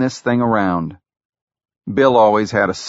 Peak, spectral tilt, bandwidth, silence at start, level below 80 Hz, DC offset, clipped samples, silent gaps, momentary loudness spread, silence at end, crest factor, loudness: 0 dBFS; -5 dB/octave; 8 kHz; 0 s; -52 dBFS; under 0.1%; under 0.1%; 1.25-1.30 s, 1.41-1.47 s; 13 LU; 0 s; 16 dB; -16 LUFS